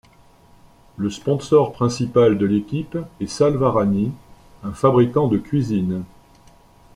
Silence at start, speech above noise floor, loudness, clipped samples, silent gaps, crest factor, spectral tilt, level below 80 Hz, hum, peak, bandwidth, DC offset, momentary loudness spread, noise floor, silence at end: 1 s; 32 dB; -19 LUFS; under 0.1%; none; 18 dB; -7.5 dB/octave; -50 dBFS; none; -4 dBFS; 11.5 kHz; under 0.1%; 13 LU; -51 dBFS; 0.9 s